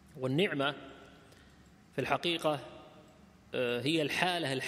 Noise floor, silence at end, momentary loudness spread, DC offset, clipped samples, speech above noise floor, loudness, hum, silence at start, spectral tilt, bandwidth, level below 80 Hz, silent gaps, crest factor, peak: -59 dBFS; 0 s; 20 LU; under 0.1%; under 0.1%; 27 dB; -33 LUFS; none; 0.15 s; -5 dB/octave; 15.5 kHz; -68 dBFS; none; 24 dB; -10 dBFS